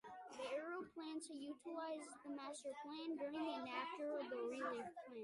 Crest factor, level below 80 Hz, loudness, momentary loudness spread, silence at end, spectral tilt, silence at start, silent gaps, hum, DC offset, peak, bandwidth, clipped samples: 16 dB; -90 dBFS; -48 LUFS; 6 LU; 0 s; -3 dB/octave; 0.05 s; none; none; under 0.1%; -32 dBFS; 11.5 kHz; under 0.1%